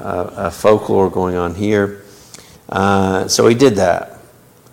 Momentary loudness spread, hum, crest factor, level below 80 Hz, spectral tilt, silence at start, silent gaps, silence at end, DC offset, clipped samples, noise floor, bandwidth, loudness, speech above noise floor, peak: 11 LU; none; 16 dB; -46 dBFS; -5 dB/octave; 0 s; none; 0.55 s; under 0.1%; under 0.1%; -45 dBFS; 17 kHz; -15 LUFS; 31 dB; 0 dBFS